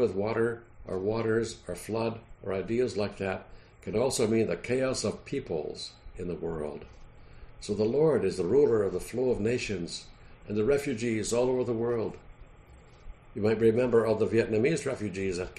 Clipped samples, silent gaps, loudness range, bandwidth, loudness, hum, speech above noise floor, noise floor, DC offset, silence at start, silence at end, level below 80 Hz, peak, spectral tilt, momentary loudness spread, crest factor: under 0.1%; none; 4 LU; 11.5 kHz; -29 LUFS; none; 24 dB; -53 dBFS; under 0.1%; 0 s; 0.05 s; -52 dBFS; -12 dBFS; -5.5 dB/octave; 14 LU; 18 dB